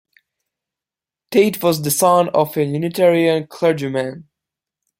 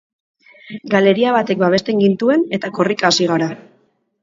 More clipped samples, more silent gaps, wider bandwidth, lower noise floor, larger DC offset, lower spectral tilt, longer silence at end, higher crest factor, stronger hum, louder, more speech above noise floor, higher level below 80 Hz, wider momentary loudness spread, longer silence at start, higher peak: neither; neither; first, 16.5 kHz vs 7.6 kHz; first, -89 dBFS vs -59 dBFS; neither; about the same, -5 dB/octave vs -5 dB/octave; about the same, 0.75 s vs 0.65 s; about the same, 18 dB vs 16 dB; neither; about the same, -17 LUFS vs -16 LUFS; first, 72 dB vs 44 dB; about the same, -62 dBFS vs -62 dBFS; second, 7 LU vs 10 LU; first, 1.3 s vs 0.65 s; about the same, -2 dBFS vs 0 dBFS